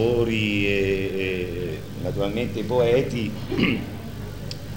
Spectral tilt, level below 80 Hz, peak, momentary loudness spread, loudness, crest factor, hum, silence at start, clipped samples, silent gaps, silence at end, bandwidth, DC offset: -6.5 dB/octave; -42 dBFS; -6 dBFS; 13 LU; -24 LUFS; 18 dB; none; 0 s; under 0.1%; none; 0 s; 16.5 kHz; 0.7%